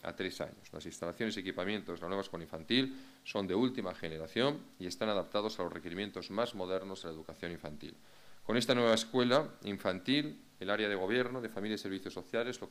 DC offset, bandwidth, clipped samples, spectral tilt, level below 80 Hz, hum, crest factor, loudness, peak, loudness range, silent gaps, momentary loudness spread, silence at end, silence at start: under 0.1%; 15.5 kHz; under 0.1%; -4.5 dB/octave; -70 dBFS; none; 24 dB; -36 LUFS; -14 dBFS; 6 LU; none; 14 LU; 0 s; 0.05 s